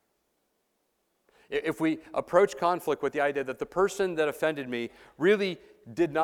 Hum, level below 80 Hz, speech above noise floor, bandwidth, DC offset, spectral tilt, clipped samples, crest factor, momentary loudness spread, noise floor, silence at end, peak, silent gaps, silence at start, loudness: none; -64 dBFS; 48 dB; 16.5 kHz; under 0.1%; -5 dB/octave; under 0.1%; 22 dB; 10 LU; -76 dBFS; 0 s; -8 dBFS; none; 1.5 s; -28 LUFS